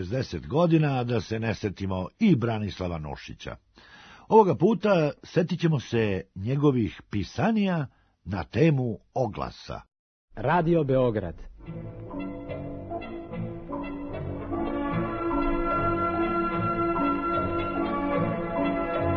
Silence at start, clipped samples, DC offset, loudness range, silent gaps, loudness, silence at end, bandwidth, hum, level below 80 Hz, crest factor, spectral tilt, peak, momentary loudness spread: 0 s; under 0.1%; under 0.1%; 7 LU; 9.99-10.28 s; -27 LUFS; 0 s; 6.6 kHz; none; -44 dBFS; 20 dB; -8 dB/octave; -6 dBFS; 14 LU